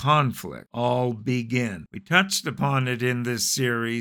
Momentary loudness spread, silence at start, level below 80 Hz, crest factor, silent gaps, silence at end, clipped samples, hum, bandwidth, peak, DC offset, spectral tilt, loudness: 8 LU; 0 s; -60 dBFS; 22 dB; none; 0 s; under 0.1%; none; 19 kHz; -2 dBFS; under 0.1%; -4 dB/octave; -24 LUFS